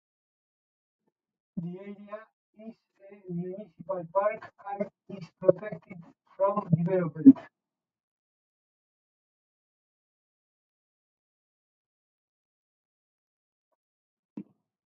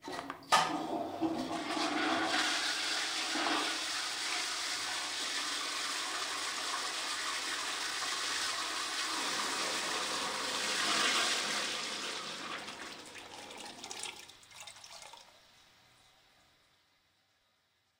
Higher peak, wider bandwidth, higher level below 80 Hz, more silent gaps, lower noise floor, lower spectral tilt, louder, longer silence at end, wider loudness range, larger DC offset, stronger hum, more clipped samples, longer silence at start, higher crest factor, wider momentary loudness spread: first, -4 dBFS vs -14 dBFS; second, 3.2 kHz vs 16 kHz; about the same, -76 dBFS vs -78 dBFS; first, 2.33-2.53 s, 8.00-14.36 s vs none; first, under -90 dBFS vs -75 dBFS; first, -10 dB/octave vs -0.5 dB/octave; first, -27 LUFS vs -34 LUFS; second, 0.45 s vs 2.6 s; about the same, 17 LU vs 15 LU; neither; neither; neither; first, 1.55 s vs 0 s; first, 28 dB vs 22 dB; first, 28 LU vs 15 LU